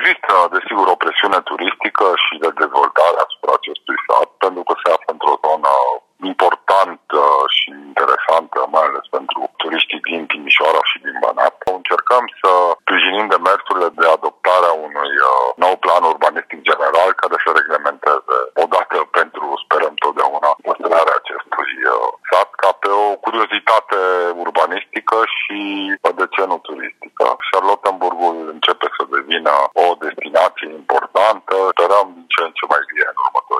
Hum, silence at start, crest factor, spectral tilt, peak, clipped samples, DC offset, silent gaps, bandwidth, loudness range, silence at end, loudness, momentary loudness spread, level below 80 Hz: none; 0 s; 16 dB; -2 dB/octave; 0 dBFS; under 0.1%; under 0.1%; none; 13.5 kHz; 3 LU; 0 s; -15 LUFS; 7 LU; -70 dBFS